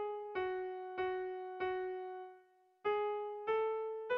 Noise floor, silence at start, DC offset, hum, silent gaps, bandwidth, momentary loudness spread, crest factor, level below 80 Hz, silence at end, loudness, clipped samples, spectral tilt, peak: -66 dBFS; 0 s; under 0.1%; none; none; 5.4 kHz; 8 LU; 14 dB; -76 dBFS; 0 s; -40 LUFS; under 0.1%; -2 dB/octave; -26 dBFS